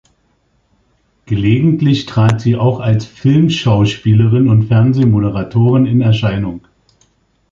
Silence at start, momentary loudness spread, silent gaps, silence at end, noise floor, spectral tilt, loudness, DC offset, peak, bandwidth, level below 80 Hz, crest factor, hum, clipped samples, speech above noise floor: 1.3 s; 6 LU; none; 0.95 s; -59 dBFS; -8 dB/octave; -13 LUFS; under 0.1%; 0 dBFS; 7.4 kHz; -40 dBFS; 12 dB; none; under 0.1%; 47 dB